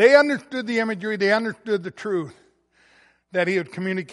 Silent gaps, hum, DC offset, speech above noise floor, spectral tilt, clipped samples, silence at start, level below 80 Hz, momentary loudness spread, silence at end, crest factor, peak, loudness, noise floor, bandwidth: none; none; under 0.1%; 38 dB; -5.5 dB/octave; under 0.1%; 0 s; -72 dBFS; 9 LU; 0 s; 20 dB; -2 dBFS; -23 LUFS; -60 dBFS; 11.5 kHz